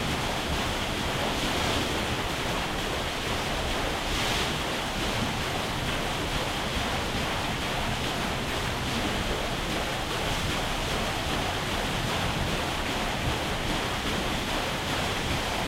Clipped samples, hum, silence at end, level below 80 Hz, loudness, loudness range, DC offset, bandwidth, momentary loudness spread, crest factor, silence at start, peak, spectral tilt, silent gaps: under 0.1%; none; 0 s; -38 dBFS; -28 LUFS; 1 LU; under 0.1%; 16 kHz; 2 LU; 14 dB; 0 s; -14 dBFS; -3.5 dB/octave; none